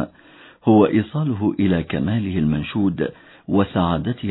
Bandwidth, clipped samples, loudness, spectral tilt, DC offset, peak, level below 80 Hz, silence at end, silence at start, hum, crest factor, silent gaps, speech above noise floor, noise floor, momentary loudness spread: 4.1 kHz; under 0.1%; -20 LUFS; -11.5 dB/octave; under 0.1%; -2 dBFS; -44 dBFS; 0 s; 0 s; none; 18 dB; none; 28 dB; -47 dBFS; 8 LU